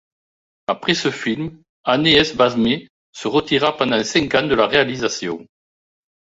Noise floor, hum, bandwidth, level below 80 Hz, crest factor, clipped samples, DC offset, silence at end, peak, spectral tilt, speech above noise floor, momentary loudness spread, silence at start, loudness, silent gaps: under -90 dBFS; none; 8 kHz; -50 dBFS; 18 dB; under 0.1%; under 0.1%; 0.85 s; -2 dBFS; -4 dB/octave; over 72 dB; 13 LU; 0.7 s; -18 LUFS; 1.69-1.84 s, 2.90-3.13 s